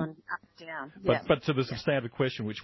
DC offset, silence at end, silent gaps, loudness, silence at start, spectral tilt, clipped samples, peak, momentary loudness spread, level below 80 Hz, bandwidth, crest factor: under 0.1%; 0 s; none; -30 LUFS; 0 s; -7 dB/octave; under 0.1%; -12 dBFS; 13 LU; -58 dBFS; 6 kHz; 18 dB